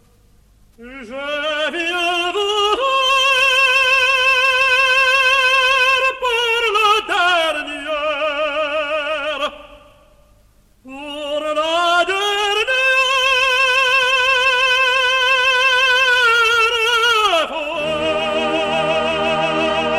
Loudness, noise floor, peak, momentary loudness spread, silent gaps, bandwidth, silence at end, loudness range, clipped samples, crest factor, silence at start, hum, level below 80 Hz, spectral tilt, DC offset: -14 LUFS; -52 dBFS; -2 dBFS; 9 LU; none; 15.5 kHz; 0 s; 9 LU; under 0.1%; 14 dB; 0.8 s; none; -50 dBFS; -1 dB/octave; under 0.1%